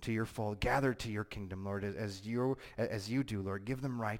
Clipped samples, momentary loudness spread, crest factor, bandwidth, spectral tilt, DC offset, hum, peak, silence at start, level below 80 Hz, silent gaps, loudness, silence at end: under 0.1%; 8 LU; 18 dB; 16.5 kHz; -6.5 dB/octave; under 0.1%; none; -18 dBFS; 0 s; -54 dBFS; none; -37 LUFS; 0 s